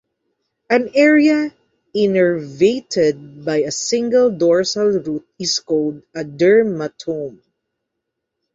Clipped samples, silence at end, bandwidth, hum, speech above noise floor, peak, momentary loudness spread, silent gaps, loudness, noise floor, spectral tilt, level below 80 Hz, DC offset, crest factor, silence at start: under 0.1%; 1.25 s; 8 kHz; none; 61 dB; -2 dBFS; 13 LU; none; -17 LUFS; -78 dBFS; -4.5 dB/octave; -60 dBFS; under 0.1%; 16 dB; 0.7 s